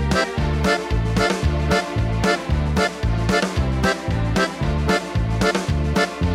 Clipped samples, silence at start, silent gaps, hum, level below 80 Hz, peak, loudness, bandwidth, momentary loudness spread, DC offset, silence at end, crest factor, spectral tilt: under 0.1%; 0 s; none; none; -26 dBFS; -6 dBFS; -21 LUFS; 15 kHz; 2 LU; under 0.1%; 0 s; 14 dB; -5.5 dB/octave